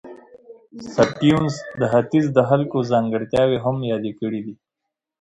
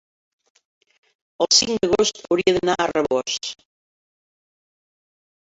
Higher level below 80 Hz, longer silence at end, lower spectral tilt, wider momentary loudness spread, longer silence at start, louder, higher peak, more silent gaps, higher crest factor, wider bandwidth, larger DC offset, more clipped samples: about the same, -52 dBFS vs -56 dBFS; second, 0.65 s vs 1.95 s; first, -7 dB/octave vs -2.5 dB/octave; about the same, 10 LU vs 11 LU; second, 0.05 s vs 1.4 s; about the same, -20 LUFS vs -19 LUFS; about the same, -4 dBFS vs -2 dBFS; neither; about the same, 18 dB vs 22 dB; first, 10.5 kHz vs 8 kHz; neither; neither